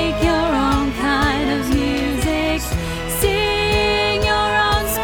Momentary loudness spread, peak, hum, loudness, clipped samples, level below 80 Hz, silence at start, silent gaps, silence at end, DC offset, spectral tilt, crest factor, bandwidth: 4 LU; -4 dBFS; none; -18 LUFS; under 0.1%; -28 dBFS; 0 s; none; 0 s; under 0.1%; -4.5 dB/octave; 14 dB; 19.5 kHz